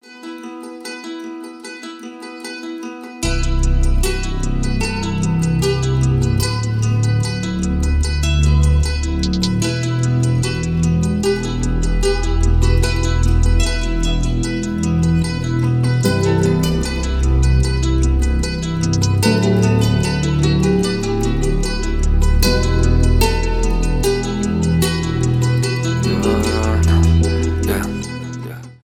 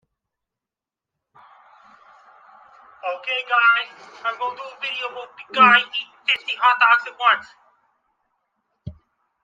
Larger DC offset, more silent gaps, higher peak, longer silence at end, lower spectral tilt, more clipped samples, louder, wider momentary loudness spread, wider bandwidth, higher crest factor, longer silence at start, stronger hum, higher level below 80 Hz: neither; neither; about the same, -2 dBFS vs -2 dBFS; second, 0.1 s vs 0.5 s; first, -6 dB/octave vs -3.5 dB/octave; neither; about the same, -17 LUFS vs -19 LUFS; second, 13 LU vs 20 LU; first, 17 kHz vs 7.6 kHz; second, 14 dB vs 22 dB; second, 0.1 s vs 3.05 s; neither; first, -20 dBFS vs -64 dBFS